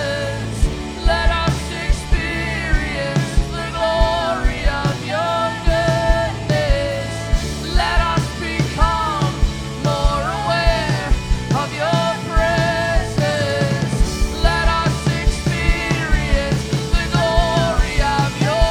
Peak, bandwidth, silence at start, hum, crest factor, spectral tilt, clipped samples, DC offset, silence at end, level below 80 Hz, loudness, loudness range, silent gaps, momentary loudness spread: 0 dBFS; 14.5 kHz; 0 s; none; 18 dB; -5 dB/octave; under 0.1%; under 0.1%; 0 s; -22 dBFS; -19 LUFS; 2 LU; none; 5 LU